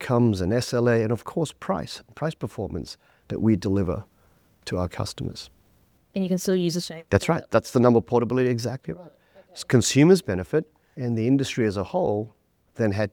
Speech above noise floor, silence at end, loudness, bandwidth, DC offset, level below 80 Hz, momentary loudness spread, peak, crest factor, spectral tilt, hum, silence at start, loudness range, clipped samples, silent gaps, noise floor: 38 dB; 0.05 s; -24 LUFS; 18 kHz; under 0.1%; -52 dBFS; 16 LU; -2 dBFS; 22 dB; -6 dB/octave; none; 0 s; 7 LU; under 0.1%; none; -62 dBFS